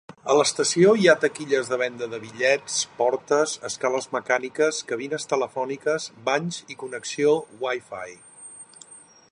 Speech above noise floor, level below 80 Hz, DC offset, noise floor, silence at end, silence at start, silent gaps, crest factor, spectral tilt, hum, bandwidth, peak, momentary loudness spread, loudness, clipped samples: 25 dB; -72 dBFS; under 0.1%; -49 dBFS; 0.35 s; 0.25 s; none; 20 dB; -3.5 dB/octave; none; 11.5 kHz; -4 dBFS; 17 LU; -23 LUFS; under 0.1%